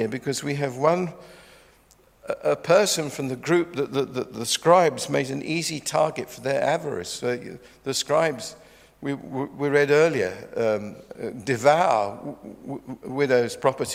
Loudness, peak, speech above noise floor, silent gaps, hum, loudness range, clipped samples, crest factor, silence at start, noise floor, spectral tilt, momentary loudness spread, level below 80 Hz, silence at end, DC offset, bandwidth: -24 LUFS; -4 dBFS; 33 dB; none; none; 4 LU; under 0.1%; 22 dB; 0 s; -57 dBFS; -4 dB/octave; 16 LU; -64 dBFS; 0 s; under 0.1%; 16 kHz